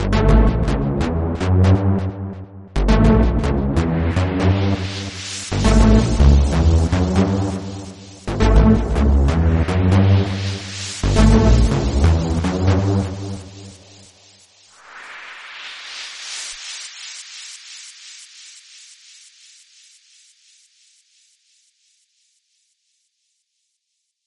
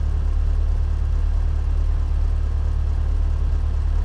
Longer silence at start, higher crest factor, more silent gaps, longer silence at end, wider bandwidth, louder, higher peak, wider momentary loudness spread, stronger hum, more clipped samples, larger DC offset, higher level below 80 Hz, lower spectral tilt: about the same, 0 s vs 0 s; first, 18 dB vs 8 dB; neither; first, 6.05 s vs 0 s; first, 11 kHz vs 5.6 kHz; first, -18 LUFS vs -24 LUFS; first, 0 dBFS vs -12 dBFS; first, 20 LU vs 1 LU; neither; neither; neither; about the same, -22 dBFS vs -20 dBFS; second, -6.5 dB/octave vs -8 dB/octave